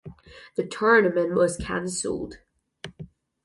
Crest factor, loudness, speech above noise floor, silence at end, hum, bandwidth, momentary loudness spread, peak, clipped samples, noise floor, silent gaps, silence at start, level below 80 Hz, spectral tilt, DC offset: 20 dB; -24 LUFS; 22 dB; 0.4 s; none; 11.5 kHz; 23 LU; -6 dBFS; under 0.1%; -45 dBFS; none; 0.05 s; -50 dBFS; -4.5 dB/octave; under 0.1%